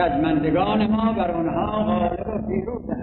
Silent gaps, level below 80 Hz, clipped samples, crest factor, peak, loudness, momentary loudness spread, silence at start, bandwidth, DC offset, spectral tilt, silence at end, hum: none; -40 dBFS; under 0.1%; 12 dB; -8 dBFS; -22 LUFS; 7 LU; 0 s; 4.3 kHz; under 0.1%; -11 dB/octave; 0 s; none